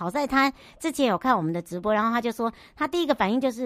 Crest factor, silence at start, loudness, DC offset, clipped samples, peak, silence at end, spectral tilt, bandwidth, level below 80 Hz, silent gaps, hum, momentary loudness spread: 18 dB; 0 s; -25 LUFS; under 0.1%; under 0.1%; -6 dBFS; 0 s; -5 dB/octave; 15.5 kHz; -56 dBFS; none; none; 8 LU